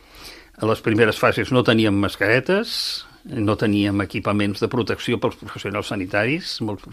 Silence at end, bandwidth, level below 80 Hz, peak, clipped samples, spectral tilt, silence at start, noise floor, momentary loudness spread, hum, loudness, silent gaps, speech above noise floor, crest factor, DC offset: 0 s; 15.5 kHz; -52 dBFS; -2 dBFS; under 0.1%; -5.5 dB/octave; 0.15 s; -42 dBFS; 10 LU; none; -21 LUFS; none; 22 dB; 20 dB; under 0.1%